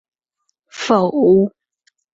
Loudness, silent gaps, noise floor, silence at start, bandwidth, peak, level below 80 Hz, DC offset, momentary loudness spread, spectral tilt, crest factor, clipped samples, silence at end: -16 LUFS; none; -72 dBFS; 0.75 s; 8 kHz; -2 dBFS; -58 dBFS; under 0.1%; 14 LU; -6.5 dB/octave; 16 dB; under 0.1%; 0.7 s